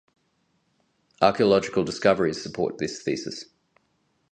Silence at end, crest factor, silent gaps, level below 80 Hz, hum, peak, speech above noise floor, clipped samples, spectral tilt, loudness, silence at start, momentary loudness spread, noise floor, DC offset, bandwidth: 0.9 s; 24 dB; none; -60 dBFS; none; -2 dBFS; 47 dB; under 0.1%; -5 dB/octave; -24 LUFS; 1.2 s; 10 LU; -70 dBFS; under 0.1%; 9.4 kHz